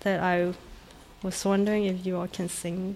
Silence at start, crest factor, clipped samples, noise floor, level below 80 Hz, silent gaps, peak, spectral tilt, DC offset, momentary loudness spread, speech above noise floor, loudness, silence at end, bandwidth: 0 s; 14 dB; under 0.1%; -49 dBFS; -54 dBFS; none; -14 dBFS; -5.5 dB/octave; under 0.1%; 9 LU; 21 dB; -28 LUFS; 0 s; 15 kHz